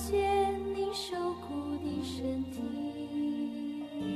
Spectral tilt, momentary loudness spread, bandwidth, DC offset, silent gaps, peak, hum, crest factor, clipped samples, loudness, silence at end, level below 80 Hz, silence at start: -5.5 dB/octave; 9 LU; 13.5 kHz; under 0.1%; none; -18 dBFS; none; 16 dB; under 0.1%; -34 LUFS; 0 s; -56 dBFS; 0 s